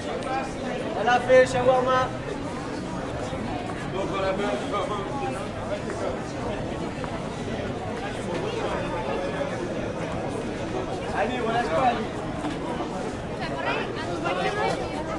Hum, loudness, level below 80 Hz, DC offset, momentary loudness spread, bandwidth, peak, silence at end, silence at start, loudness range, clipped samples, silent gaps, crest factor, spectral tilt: none; -27 LUFS; -46 dBFS; under 0.1%; 9 LU; 11.5 kHz; -6 dBFS; 0 s; 0 s; 6 LU; under 0.1%; none; 20 dB; -5.5 dB/octave